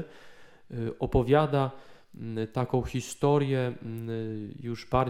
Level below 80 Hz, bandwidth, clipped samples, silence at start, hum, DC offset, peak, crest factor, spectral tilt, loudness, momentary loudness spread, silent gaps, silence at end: -46 dBFS; 14.5 kHz; under 0.1%; 0 s; none; under 0.1%; -8 dBFS; 20 dB; -7 dB/octave; -29 LUFS; 14 LU; none; 0 s